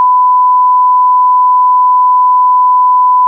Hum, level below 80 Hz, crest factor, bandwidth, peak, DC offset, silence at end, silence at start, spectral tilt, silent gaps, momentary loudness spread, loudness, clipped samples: none; under -90 dBFS; 4 dB; 1.1 kHz; -4 dBFS; under 0.1%; 0 s; 0 s; -4 dB/octave; none; 0 LU; -7 LUFS; under 0.1%